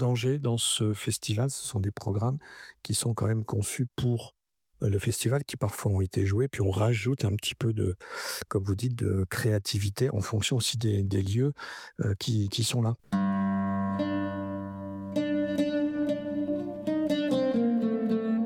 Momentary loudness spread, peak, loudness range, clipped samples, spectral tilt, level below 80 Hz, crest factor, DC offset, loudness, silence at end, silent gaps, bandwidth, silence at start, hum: 7 LU; -14 dBFS; 2 LU; under 0.1%; -5.5 dB/octave; -58 dBFS; 14 dB; under 0.1%; -29 LUFS; 0 s; none; 16.5 kHz; 0 s; none